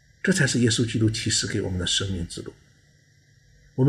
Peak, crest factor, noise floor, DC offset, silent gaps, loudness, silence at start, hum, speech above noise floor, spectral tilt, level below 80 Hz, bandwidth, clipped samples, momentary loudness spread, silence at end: -8 dBFS; 18 dB; -59 dBFS; under 0.1%; none; -23 LUFS; 0.25 s; none; 35 dB; -4 dB/octave; -48 dBFS; 13 kHz; under 0.1%; 15 LU; 0 s